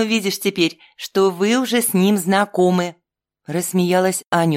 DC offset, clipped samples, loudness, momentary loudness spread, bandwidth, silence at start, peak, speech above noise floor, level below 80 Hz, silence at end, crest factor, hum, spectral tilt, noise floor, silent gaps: under 0.1%; under 0.1%; -18 LUFS; 8 LU; 16.5 kHz; 0 s; -4 dBFS; 49 dB; -68 dBFS; 0 s; 14 dB; none; -4.5 dB/octave; -66 dBFS; 4.27-4.31 s